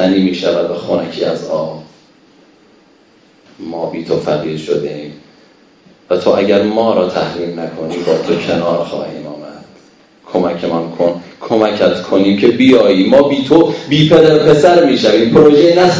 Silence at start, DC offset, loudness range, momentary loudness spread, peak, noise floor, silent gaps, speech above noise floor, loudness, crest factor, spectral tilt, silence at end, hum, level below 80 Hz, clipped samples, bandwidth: 0 s; under 0.1%; 12 LU; 15 LU; 0 dBFS; -48 dBFS; none; 37 dB; -12 LUFS; 12 dB; -6.5 dB/octave; 0 s; none; -48 dBFS; 0.9%; 8 kHz